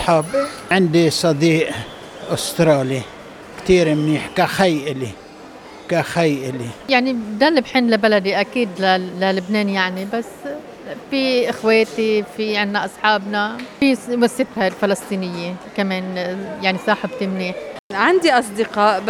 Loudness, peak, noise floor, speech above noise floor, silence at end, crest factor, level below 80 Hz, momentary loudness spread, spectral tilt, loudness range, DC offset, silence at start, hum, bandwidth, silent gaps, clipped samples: -18 LUFS; -2 dBFS; -38 dBFS; 20 dB; 0 s; 16 dB; -50 dBFS; 13 LU; -5 dB/octave; 3 LU; under 0.1%; 0 s; none; 18.5 kHz; 17.79-17.90 s; under 0.1%